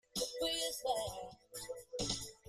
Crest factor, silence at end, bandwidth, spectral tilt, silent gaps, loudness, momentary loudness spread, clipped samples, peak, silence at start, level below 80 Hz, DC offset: 22 dB; 0 s; 15.5 kHz; -2 dB/octave; none; -39 LUFS; 13 LU; under 0.1%; -20 dBFS; 0.15 s; -62 dBFS; under 0.1%